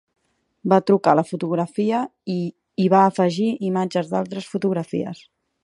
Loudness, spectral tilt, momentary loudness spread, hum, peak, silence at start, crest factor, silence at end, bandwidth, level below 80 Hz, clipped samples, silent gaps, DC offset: -21 LUFS; -7.5 dB/octave; 12 LU; none; -2 dBFS; 0.65 s; 20 dB; 0.5 s; 11 kHz; -70 dBFS; under 0.1%; none; under 0.1%